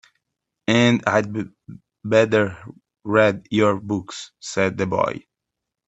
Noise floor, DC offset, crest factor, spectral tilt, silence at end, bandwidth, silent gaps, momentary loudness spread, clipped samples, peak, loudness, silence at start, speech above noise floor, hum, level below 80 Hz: -83 dBFS; under 0.1%; 20 dB; -5.5 dB/octave; 0.7 s; 8.4 kHz; none; 18 LU; under 0.1%; -2 dBFS; -20 LUFS; 0.7 s; 63 dB; none; -60 dBFS